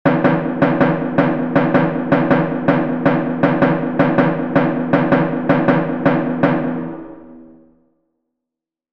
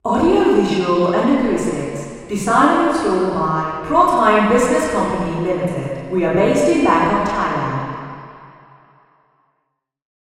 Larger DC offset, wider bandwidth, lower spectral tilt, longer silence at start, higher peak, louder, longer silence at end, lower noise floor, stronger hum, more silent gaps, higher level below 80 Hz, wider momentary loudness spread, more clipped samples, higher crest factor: first, 0.9% vs under 0.1%; second, 5.6 kHz vs 13.5 kHz; first, -9.5 dB/octave vs -6 dB/octave; about the same, 0.05 s vs 0.05 s; about the same, 0 dBFS vs 0 dBFS; about the same, -16 LUFS vs -16 LUFS; second, 1.4 s vs 1.8 s; first, -84 dBFS vs -72 dBFS; neither; neither; second, -48 dBFS vs -42 dBFS; second, 2 LU vs 11 LU; neither; about the same, 16 dB vs 18 dB